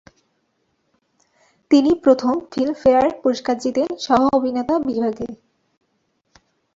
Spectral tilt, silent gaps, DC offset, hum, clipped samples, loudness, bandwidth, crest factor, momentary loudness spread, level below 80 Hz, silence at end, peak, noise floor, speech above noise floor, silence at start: -5.5 dB/octave; none; under 0.1%; none; under 0.1%; -18 LUFS; 7.8 kHz; 18 dB; 7 LU; -54 dBFS; 1.4 s; -2 dBFS; -69 dBFS; 51 dB; 1.7 s